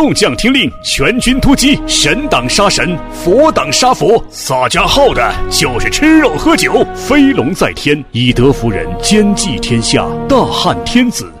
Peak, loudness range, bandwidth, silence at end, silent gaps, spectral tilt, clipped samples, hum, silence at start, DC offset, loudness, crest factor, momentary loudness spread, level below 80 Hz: 0 dBFS; 2 LU; 16 kHz; 0 s; none; -4 dB/octave; 0.1%; none; 0 s; under 0.1%; -10 LUFS; 10 dB; 5 LU; -24 dBFS